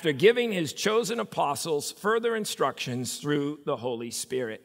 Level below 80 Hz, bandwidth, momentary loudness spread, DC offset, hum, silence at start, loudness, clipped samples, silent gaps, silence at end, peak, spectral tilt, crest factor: -76 dBFS; 16 kHz; 9 LU; under 0.1%; none; 0 s; -28 LUFS; under 0.1%; none; 0.05 s; -6 dBFS; -4 dB/octave; 20 dB